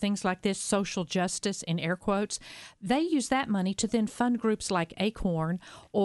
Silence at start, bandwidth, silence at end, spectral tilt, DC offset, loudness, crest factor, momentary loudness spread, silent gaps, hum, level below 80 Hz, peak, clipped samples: 0 s; 11.5 kHz; 0 s; -4.5 dB/octave; under 0.1%; -29 LUFS; 18 dB; 6 LU; none; none; -54 dBFS; -12 dBFS; under 0.1%